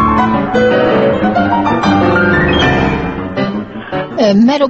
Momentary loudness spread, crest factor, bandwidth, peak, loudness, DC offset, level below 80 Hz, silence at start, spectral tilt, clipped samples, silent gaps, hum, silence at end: 9 LU; 12 dB; 8 kHz; 0 dBFS; -12 LUFS; under 0.1%; -30 dBFS; 0 s; -7 dB/octave; under 0.1%; none; none; 0 s